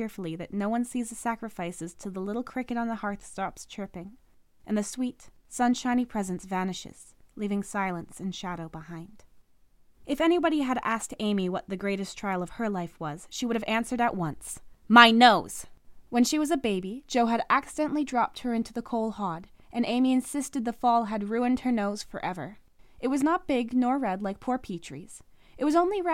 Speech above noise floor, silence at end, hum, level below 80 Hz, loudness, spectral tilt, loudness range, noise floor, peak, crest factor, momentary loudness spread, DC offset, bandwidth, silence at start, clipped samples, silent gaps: 33 dB; 0 s; none; -56 dBFS; -27 LUFS; -4.5 dB/octave; 11 LU; -61 dBFS; 0 dBFS; 28 dB; 14 LU; under 0.1%; 16 kHz; 0 s; under 0.1%; none